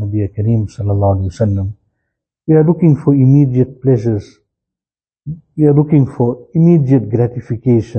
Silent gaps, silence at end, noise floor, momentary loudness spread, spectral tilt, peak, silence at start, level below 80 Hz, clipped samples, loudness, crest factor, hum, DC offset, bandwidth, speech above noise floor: none; 0 s; under -90 dBFS; 11 LU; -11 dB/octave; 0 dBFS; 0 s; -44 dBFS; under 0.1%; -13 LUFS; 12 dB; none; under 0.1%; 6.6 kHz; over 78 dB